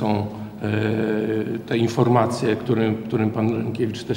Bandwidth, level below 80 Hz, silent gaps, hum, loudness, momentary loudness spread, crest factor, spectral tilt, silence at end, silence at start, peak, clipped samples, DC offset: 16.5 kHz; -58 dBFS; none; none; -22 LUFS; 7 LU; 18 dB; -7.5 dB/octave; 0 s; 0 s; -4 dBFS; under 0.1%; under 0.1%